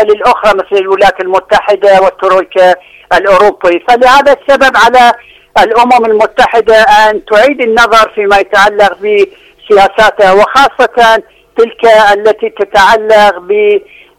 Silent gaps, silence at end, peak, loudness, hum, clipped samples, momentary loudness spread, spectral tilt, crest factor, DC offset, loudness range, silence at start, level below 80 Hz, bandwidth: none; 0.4 s; 0 dBFS; -6 LUFS; none; 4%; 6 LU; -3 dB/octave; 6 dB; under 0.1%; 1 LU; 0 s; -36 dBFS; 16 kHz